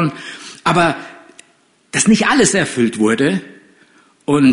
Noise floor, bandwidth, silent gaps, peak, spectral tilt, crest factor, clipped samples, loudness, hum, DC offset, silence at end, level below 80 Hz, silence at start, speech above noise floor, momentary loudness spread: -55 dBFS; 11 kHz; none; -2 dBFS; -4 dB/octave; 14 dB; under 0.1%; -15 LUFS; none; under 0.1%; 0 s; -52 dBFS; 0 s; 41 dB; 17 LU